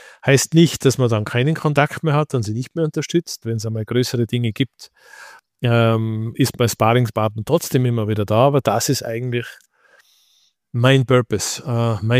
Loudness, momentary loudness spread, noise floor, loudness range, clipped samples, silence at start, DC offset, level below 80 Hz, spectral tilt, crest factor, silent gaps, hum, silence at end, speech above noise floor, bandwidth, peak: -19 LUFS; 9 LU; -60 dBFS; 4 LU; under 0.1%; 0.25 s; under 0.1%; -54 dBFS; -5.5 dB/octave; 16 dB; none; none; 0 s; 42 dB; 15.5 kHz; -2 dBFS